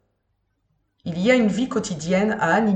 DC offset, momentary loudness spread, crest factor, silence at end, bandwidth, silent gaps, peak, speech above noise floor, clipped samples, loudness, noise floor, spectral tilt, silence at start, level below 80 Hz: under 0.1%; 10 LU; 18 dB; 0 s; 8.8 kHz; none; -4 dBFS; 51 dB; under 0.1%; -21 LUFS; -71 dBFS; -5.5 dB/octave; 1.05 s; -56 dBFS